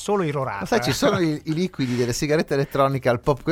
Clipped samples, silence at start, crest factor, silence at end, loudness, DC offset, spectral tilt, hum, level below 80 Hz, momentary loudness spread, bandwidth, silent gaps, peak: under 0.1%; 0 s; 18 dB; 0 s; -22 LUFS; under 0.1%; -5.5 dB/octave; none; -46 dBFS; 5 LU; 16.5 kHz; none; -4 dBFS